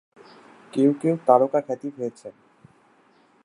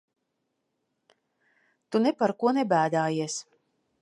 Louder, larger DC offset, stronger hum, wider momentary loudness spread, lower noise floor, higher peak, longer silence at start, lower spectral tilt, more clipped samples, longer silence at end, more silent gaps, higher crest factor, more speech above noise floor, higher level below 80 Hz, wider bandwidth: first, -22 LUFS vs -26 LUFS; neither; neither; first, 17 LU vs 8 LU; second, -59 dBFS vs -79 dBFS; first, -2 dBFS vs -10 dBFS; second, 0.75 s vs 1.9 s; first, -8 dB/octave vs -5 dB/octave; neither; first, 1.15 s vs 0.6 s; neither; about the same, 22 dB vs 20 dB; second, 37 dB vs 54 dB; about the same, -78 dBFS vs -80 dBFS; about the same, 11 kHz vs 11.5 kHz